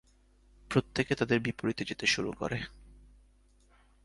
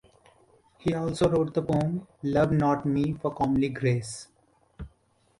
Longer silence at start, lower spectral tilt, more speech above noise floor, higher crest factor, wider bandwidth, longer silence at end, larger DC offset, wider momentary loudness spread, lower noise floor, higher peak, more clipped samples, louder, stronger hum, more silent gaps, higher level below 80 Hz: second, 0.7 s vs 0.85 s; second, -4.5 dB/octave vs -7 dB/octave; second, 32 dB vs 41 dB; first, 22 dB vs 16 dB; about the same, 11.5 kHz vs 11.5 kHz; first, 1.1 s vs 0.55 s; neither; second, 7 LU vs 17 LU; about the same, -64 dBFS vs -66 dBFS; about the same, -12 dBFS vs -12 dBFS; neither; second, -31 LUFS vs -27 LUFS; neither; neither; second, -56 dBFS vs -50 dBFS